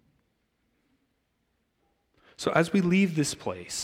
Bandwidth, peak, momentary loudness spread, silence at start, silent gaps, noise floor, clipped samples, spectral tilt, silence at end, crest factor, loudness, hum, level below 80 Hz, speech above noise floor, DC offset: 15.5 kHz; -8 dBFS; 10 LU; 2.4 s; none; -75 dBFS; under 0.1%; -5 dB/octave; 0 s; 22 dB; -26 LUFS; none; -64 dBFS; 49 dB; under 0.1%